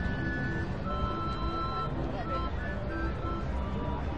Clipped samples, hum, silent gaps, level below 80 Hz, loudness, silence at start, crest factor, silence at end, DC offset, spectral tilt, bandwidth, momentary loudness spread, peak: under 0.1%; none; none; -38 dBFS; -34 LUFS; 0 s; 16 dB; 0 s; 0.7%; -7.5 dB/octave; 8 kHz; 2 LU; -16 dBFS